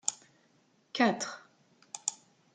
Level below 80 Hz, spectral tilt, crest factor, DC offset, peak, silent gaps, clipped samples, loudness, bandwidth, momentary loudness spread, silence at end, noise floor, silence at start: -84 dBFS; -2.5 dB/octave; 26 dB; under 0.1%; -10 dBFS; none; under 0.1%; -33 LUFS; 9.6 kHz; 20 LU; 0.4 s; -69 dBFS; 0.05 s